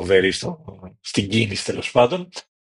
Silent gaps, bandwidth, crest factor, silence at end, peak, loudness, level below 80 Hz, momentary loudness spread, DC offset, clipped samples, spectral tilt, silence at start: none; 11.5 kHz; 20 dB; 0.25 s; -2 dBFS; -21 LUFS; -54 dBFS; 18 LU; under 0.1%; under 0.1%; -4.5 dB/octave; 0 s